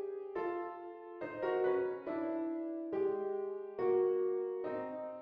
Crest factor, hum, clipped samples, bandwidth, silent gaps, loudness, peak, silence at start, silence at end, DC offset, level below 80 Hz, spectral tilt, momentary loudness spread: 14 dB; none; under 0.1%; 5 kHz; none; -37 LUFS; -24 dBFS; 0 s; 0 s; under 0.1%; -78 dBFS; -5.5 dB/octave; 10 LU